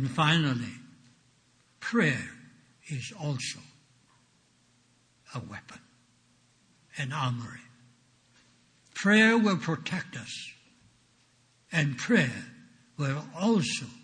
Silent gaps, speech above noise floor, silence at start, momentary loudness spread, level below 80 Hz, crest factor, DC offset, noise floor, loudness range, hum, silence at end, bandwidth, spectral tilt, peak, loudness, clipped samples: none; 38 dB; 0 s; 20 LU; -70 dBFS; 22 dB; under 0.1%; -66 dBFS; 13 LU; none; 0.05 s; 10 kHz; -5 dB/octave; -10 dBFS; -28 LUFS; under 0.1%